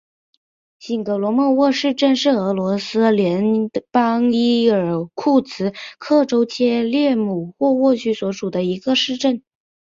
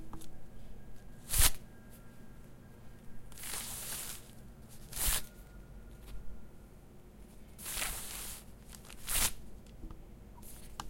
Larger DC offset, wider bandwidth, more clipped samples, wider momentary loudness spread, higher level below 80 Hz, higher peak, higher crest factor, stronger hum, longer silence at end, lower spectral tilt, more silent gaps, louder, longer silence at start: neither; second, 7.6 kHz vs 16.5 kHz; neither; second, 7 LU vs 24 LU; second, -62 dBFS vs -44 dBFS; first, -2 dBFS vs -10 dBFS; second, 16 dB vs 28 dB; neither; first, 0.6 s vs 0 s; first, -6 dB/octave vs -1.5 dB/octave; neither; first, -18 LUFS vs -35 LUFS; first, 0.85 s vs 0 s